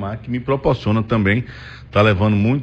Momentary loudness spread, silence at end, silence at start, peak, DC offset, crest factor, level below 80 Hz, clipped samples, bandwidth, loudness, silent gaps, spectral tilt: 10 LU; 0 s; 0 s; -4 dBFS; under 0.1%; 14 dB; -40 dBFS; under 0.1%; 6.6 kHz; -18 LUFS; none; -8.5 dB/octave